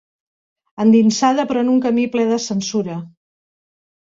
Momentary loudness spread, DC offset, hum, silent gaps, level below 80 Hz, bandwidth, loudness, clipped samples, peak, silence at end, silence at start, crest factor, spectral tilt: 10 LU; under 0.1%; none; none; -62 dBFS; 7.8 kHz; -17 LUFS; under 0.1%; -2 dBFS; 1.05 s; 0.8 s; 16 dB; -5 dB/octave